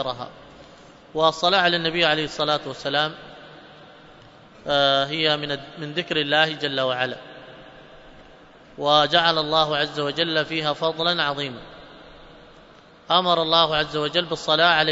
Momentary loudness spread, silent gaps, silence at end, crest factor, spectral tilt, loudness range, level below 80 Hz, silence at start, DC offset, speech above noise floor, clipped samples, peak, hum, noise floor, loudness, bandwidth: 14 LU; none; 0 s; 22 dB; -4 dB/octave; 4 LU; -56 dBFS; 0 s; under 0.1%; 27 dB; under 0.1%; -2 dBFS; none; -49 dBFS; -21 LUFS; 8 kHz